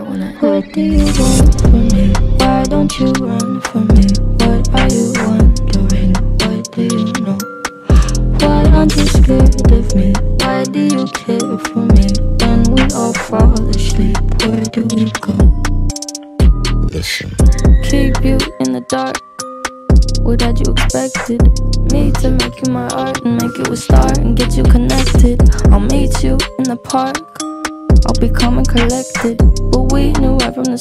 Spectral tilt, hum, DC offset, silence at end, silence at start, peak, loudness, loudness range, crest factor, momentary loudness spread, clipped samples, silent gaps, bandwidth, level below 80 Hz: -5.5 dB/octave; none; under 0.1%; 0 s; 0 s; 0 dBFS; -13 LUFS; 3 LU; 10 dB; 7 LU; under 0.1%; none; 14 kHz; -14 dBFS